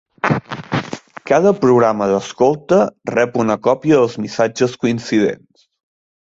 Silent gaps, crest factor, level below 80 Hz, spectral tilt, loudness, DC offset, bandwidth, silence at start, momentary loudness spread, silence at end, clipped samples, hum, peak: none; 16 dB; -54 dBFS; -6 dB/octave; -16 LUFS; under 0.1%; 7.8 kHz; 0.25 s; 10 LU; 0.85 s; under 0.1%; none; -2 dBFS